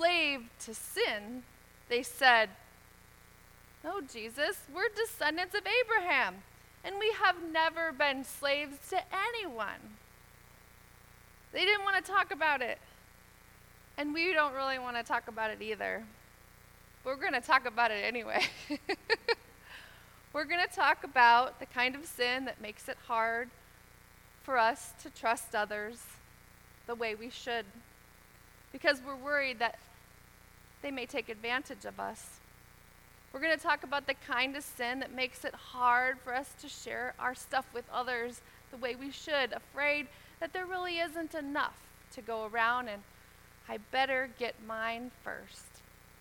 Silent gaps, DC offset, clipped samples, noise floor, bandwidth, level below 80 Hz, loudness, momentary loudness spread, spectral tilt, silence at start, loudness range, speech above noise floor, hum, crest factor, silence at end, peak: none; under 0.1%; under 0.1%; -59 dBFS; 19 kHz; -64 dBFS; -33 LUFS; 16 LU; -2 dB/octave; 0 s; 7 LU; 25 dB; 60 Hz at -65 dBFS; 26 dB; 0.4 s; -8 dBFS